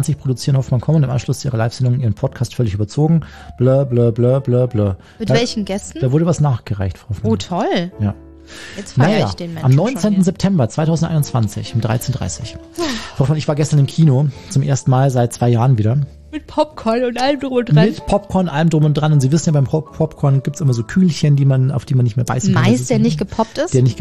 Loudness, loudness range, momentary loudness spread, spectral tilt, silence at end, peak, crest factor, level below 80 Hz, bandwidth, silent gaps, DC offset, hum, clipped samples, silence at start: -16 LUFS; 3 LU; 8 LU; -7 dB/octave; 0 s; -2 dBFS; 14 dB; -42 dBFS; 13.5 kHz; none; 0.5%; none; under 0.1%; 0 s